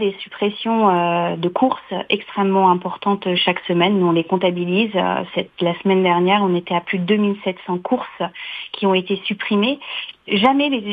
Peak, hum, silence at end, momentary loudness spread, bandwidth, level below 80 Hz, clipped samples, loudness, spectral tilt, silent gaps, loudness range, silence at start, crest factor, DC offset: 0 dBFS; none; 0 s; 9 LU; 5 kHz; -64 dBFS; under 0.1%; -19 LUFS; -8.5 dB/octave; none; 3 LU; 0 s; 18 dB; under 0.1%